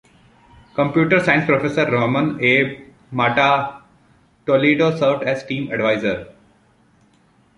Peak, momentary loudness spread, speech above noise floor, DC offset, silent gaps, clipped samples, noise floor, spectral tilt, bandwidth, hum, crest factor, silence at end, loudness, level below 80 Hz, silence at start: -2 dBFS; 12 LU; 39 dB; under 0.1%; none; under 0.1%; -56 dBFS; -6.5 dB/octave; 11 kHz; none; 18 dB; 1.25 s; -18 LUFS; -54 dBFS; 0.75 s